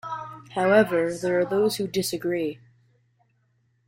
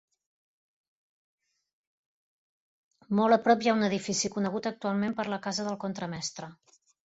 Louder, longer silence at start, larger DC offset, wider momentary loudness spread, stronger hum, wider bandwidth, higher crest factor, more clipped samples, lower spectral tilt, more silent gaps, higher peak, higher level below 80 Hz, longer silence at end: first, -24 LUFS vs -29 LUFS; second, 0.05 s vs 3.1 s; neither; first, 15 LU vs 12 LU; neither; first, 16 kHz vs 8 kHz; about the same, 18 dB vs 22 dB; neither; about the same, -5 dB/octave vs -4.5 dB/octave; neither; first, -6 dBFS vs -10 dBFS; first, -64 dBFS vs -70 dBFS; first, 1.3 s vs 0.5 s